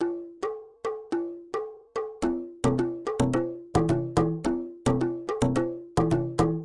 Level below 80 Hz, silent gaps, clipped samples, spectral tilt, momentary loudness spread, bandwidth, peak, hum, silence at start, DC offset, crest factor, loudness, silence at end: -46 dBFS; none; under 0.1%; -7 dB/octave; 9 LU; 11.5 kHz; -8 dBFS; none; 0 s; under 0.1%; 20 dB; -28 LUFS; 0 s